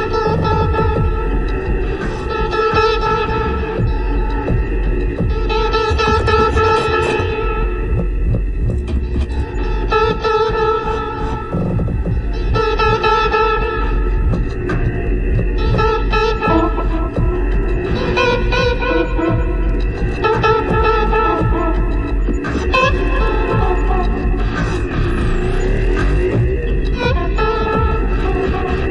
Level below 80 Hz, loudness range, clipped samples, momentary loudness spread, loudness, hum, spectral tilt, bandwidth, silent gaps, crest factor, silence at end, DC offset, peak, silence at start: -18 dBFS; 2 LU; under 0.1%; 6 LU; -17 LUFS; none; -7 dB/octave; 8.4 kHz; none; 14 dB; 0 s; under 0.1%; 0 dBFS; 0 s